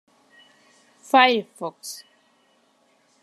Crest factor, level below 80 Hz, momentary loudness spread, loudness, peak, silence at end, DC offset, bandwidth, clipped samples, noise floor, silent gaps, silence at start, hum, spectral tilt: 24 dB; -88 dBFS; 20 LU; -20 LUFS; -2 dBFS; 1.25 s; under 0.1%; 13.5 kHz; under 0.1%; -63 dBFS; none; 1.15 s; none; -2.5 dB/octave